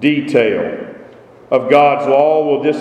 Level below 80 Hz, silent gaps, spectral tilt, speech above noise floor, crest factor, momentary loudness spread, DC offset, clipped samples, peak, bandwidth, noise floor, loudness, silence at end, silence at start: -60 dBFS; none; -6.5 dB/octave; 27 dB; 14 dB; 12 LU; under 0.1%; under 0.1%; 0 dBFS; 9.4 kHz; -39 dBFS; -13 LUFS; 0 s; 0 s